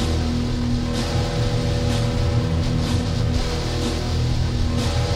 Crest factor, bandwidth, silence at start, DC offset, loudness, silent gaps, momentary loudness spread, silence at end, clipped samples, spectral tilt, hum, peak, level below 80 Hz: 14 dB; 13.5 kHz; 0 s; under 0.1%; -22 LUFS; none; 2 LU; 0 s; under 0.1%; -6 dB/octave; none; -8 dBFS; -26 dBFS